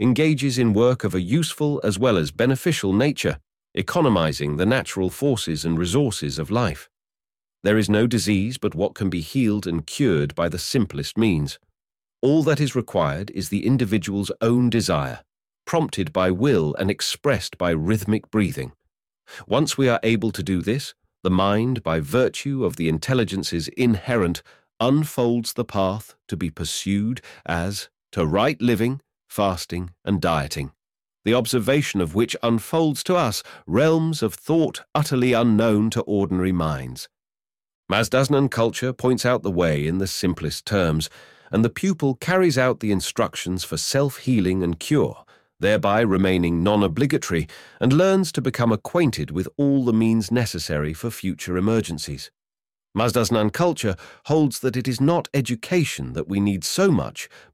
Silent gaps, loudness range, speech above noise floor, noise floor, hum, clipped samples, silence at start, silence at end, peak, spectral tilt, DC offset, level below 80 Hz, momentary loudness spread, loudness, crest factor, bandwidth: 37.75-37.83 s; 3 LU; over 69 dB; under -90 dBFS; none; under 0.1%; 0 s; 0.15 s; -6 dBFS; -5.5 dB/octave; under 0.1%; -46 dBFS; 9 LU; -22 LUFS; 16 dB; 16.5 kHz